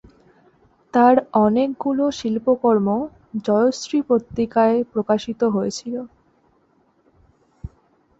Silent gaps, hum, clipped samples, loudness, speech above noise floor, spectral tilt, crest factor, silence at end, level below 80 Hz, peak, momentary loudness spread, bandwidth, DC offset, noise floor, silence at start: none; none; under 0.1%; -20 LUFS; 42 dB; -6 dB/octave; 18 dB; 0.5 s; -52 dBFS; -4 dBFS; 14 LU; 8 kHz; under 0.1%; -61 dBFS; 0.95 s